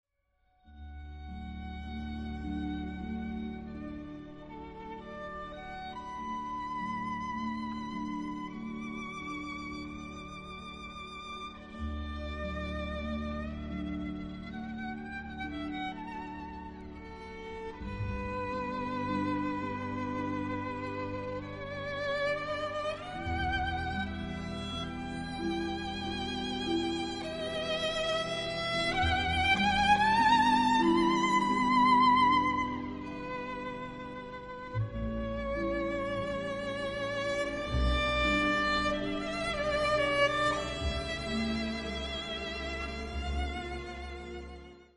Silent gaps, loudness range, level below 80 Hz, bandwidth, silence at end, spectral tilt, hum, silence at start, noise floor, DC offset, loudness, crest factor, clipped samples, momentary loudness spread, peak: none; 14 LU; -44 dBFS; 11.5 kHz; 0.1 s; -5 dB/octave; none; 0.65 s; -74 dBFS; under 0.1%; -33 LUFS; 18 dB; under 0.1%; 17 LU; -14 dBFS